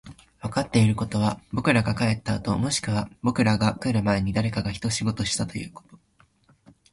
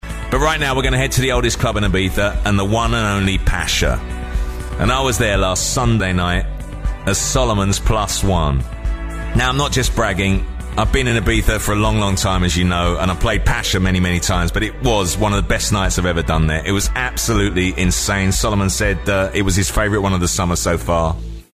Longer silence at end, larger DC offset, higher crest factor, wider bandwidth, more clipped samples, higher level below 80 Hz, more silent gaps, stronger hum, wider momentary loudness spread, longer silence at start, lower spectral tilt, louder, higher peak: first, 1 s vs 0.15 s; neither; first, 20 dB vs 14 dB; second, 11.5 kHz vs 15.5 kHz; neither; second, -46 dBFS vs -22 dBFS; neither; neither; about the same, 7 LU vs 5 LU; about the same, 0.05 s vs 0.05 s; about the same, -5.5 dB/octave vs -4.5 dB/octave; second, -25 LUFS vs -17 LUFS; second, -6 dBFS vs -2 dBFS